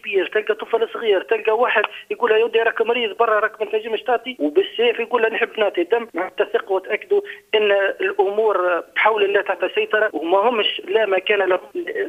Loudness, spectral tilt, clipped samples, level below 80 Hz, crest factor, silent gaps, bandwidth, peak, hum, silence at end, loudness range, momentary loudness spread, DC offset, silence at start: -19 LUFS; -4 dB/octave; under 0.1%; -70 dBFS; 20 dB; none; 4.8 kHz; 0 dBFS; none; 0 s; 2 LU; 5 LU; under 0.1%; 0.05 s